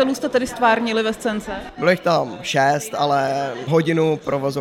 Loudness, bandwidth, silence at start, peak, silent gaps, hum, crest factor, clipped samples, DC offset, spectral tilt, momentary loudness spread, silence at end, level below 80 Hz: -20 LUFS; 17 kHz; 0 s; -2 dBFS; none; none; 16 dB; under 0.1%; under 0.1%; -5 dB/octave; 7 LU; 0 s; -50 dBFS